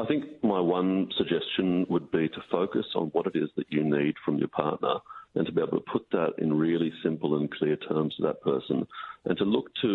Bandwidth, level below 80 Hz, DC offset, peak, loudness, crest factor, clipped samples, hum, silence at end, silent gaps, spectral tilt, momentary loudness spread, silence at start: 4.3 kHz; -68 dBFS; under 0.1%; -8 dBFS; -28 LUFS; 20 dB; under 0.1%; none; 0 s; none; -9.5 dB/octave; 5 LU; 0 s